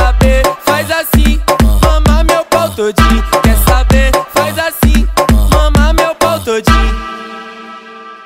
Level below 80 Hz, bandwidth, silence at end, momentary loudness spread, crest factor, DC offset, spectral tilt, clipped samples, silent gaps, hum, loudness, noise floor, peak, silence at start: -12 dBFS; 16.5 kHz; 0 s; 14 LU; 10 dB; under 0.1%; -5 dB/octave; under 0.1%; none; none; -11 LUFS; -31 dBFS; 0 dBFS; 0 s